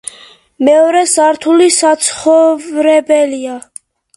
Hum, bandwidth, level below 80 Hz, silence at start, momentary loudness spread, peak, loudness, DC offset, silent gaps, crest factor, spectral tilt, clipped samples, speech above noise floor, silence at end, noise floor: none; 11.5 kHz; -60 dBFS; 0.6 s; 12 LU; 0 dBFS; -10 LUFS; under 0.1%; none; 12 dB; -1.5 dB/octave; under 0.1%; 30 dB; 0.55 s; -40 dBFS